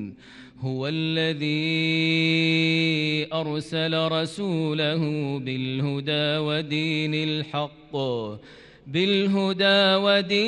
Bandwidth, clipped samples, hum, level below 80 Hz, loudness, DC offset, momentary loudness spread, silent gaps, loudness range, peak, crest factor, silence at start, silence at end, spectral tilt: 10.5 kHz; under 0.1%; none; -64 dBFS; -23 LUFS; under 0.1%; 10 LU; none; 3 LU; -10 dBFS; 16 dB; 0 s; 0 s; -6 dB/octave